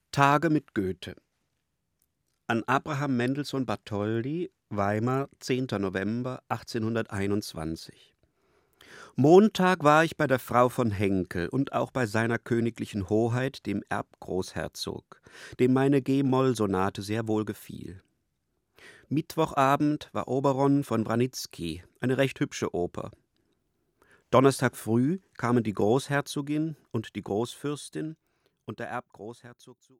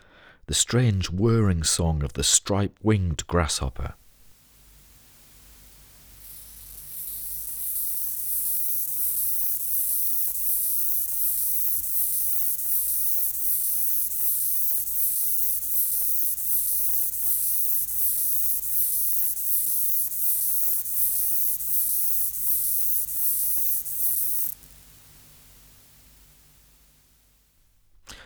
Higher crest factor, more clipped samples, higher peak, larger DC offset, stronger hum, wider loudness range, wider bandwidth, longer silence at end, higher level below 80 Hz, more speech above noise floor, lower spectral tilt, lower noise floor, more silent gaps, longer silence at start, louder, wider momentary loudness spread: about the same, 22 dB vs 22 dB; neither; about the same, -6 dBFS vs -4 dBFS; neither; second, none vs 50 Hz at -55 dBFS; about the same, 8 LU vs 9 LU; second, 16 kHz vs over 20 kHz; first, 0.3 s vs 0 s; second, -62 dBFS vs -44 dBFS; first, 52 dB vs 38 dB; first, -6.5 dB/octave vs -3.5 dB/octave; first, -79 dBFS vs -61 dBFS; neither; second, 0.15 s vs 0.5 s; second, -27 LUFS vs -21 LUFS; first, 14 LU vs 7 LU